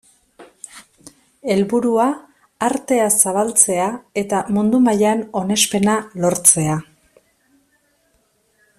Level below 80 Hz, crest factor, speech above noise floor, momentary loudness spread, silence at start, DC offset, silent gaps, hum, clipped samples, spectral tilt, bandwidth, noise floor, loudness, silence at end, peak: -56 dBFS; 20 dB; 45 dB; 12 LU; 0.4 s; under 0.1%; none; none; under 0.1%; -3.5 dB/octave; 15.5 kHz; -62 dBFS; -16 LUFS; 1.95 s; 0 dBFS